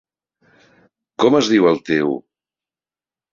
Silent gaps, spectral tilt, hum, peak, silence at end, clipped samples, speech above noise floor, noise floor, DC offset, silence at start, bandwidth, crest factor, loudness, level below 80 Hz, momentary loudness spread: none; -5 dB/octave; none; -2 dBFS; 1.15 s; under 0.1%; over 75 dB; under -90 dBFS; under 0.1%; 1.2 s; 7.4 kHz; 18 dB; -16 LUFS; -62 dBFS; 13 LU